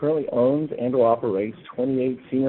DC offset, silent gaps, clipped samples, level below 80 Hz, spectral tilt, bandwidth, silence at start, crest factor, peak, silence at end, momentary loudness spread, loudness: under 0.1%; none; under 0.1%; -62 dBFS; -8 dB/octave; 4.2 kHz; 0 s; 14 dB; -8 dBFS; 0 s; 7 LU; -23 LUFS